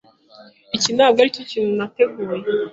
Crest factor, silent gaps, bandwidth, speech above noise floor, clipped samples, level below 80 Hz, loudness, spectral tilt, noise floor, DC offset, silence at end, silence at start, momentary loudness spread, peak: 18 dB; none; 8 kHz; 29 dB; under 0.1%; -64 dBFS; -19 LUFS; -3 dB/octave; -47 dBFS; under 0.1%; 0 s; 0.4 s; 9 LU; -2 dBFS